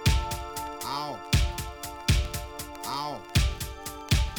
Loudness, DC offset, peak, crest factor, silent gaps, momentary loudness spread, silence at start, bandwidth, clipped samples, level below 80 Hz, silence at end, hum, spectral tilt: -30 LUFS; under 0.1%; -10 dBFS; 20 dB; none; 9 LU; 0 s; over 20 kHz; under 0.1%; -32 dBFS; 0 s; none; -4 dB/octave